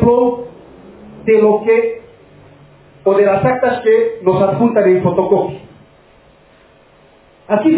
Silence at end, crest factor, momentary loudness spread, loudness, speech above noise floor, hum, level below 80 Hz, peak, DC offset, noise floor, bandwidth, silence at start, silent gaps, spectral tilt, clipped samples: 0 s; 14 dB; 12 LU; -14 LUFS; 35 dB; none; -44 dBFS; 0 dBFS; under 0.1%; -47 dBFS; 4 kHz; 0 s; none; -11.5 dB/octave; under 0.1%